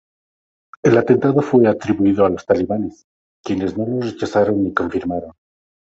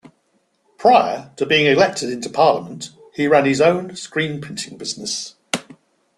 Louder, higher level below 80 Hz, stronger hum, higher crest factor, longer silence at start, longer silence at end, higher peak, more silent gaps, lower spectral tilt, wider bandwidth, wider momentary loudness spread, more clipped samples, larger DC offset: about the same, -18 LUFS vs -18 LUFS; first, -48 dBFS vs -60 dBFS; neither; about the same, 18 dB vs 18 dB; about the same, 0.85 s vs 0.8 s; about the same, 0.65 s vs 0.55 s; about the same, -2 dBFS vs 0 dBFS; first, 3.04-3.44 s vs none; first, -7.5 dB/octave vs -4 dB/octave; second, 7.8 kHz vs 12.5 kHz; about the same, 11 LU vs 13 LU; neither; neither